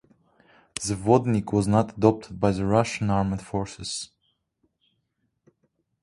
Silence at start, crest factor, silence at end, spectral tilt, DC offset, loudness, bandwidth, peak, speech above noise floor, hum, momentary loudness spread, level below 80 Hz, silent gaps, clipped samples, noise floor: 0.8 s; 24 dB; 2 s; -6 dB/octave; under 0.1%; -24 LUFS; 11.5 kHz; -2 dBFS; 52 dB; none; 11 LU; -50 dBFS; none; under 0.1%; -75 dBFS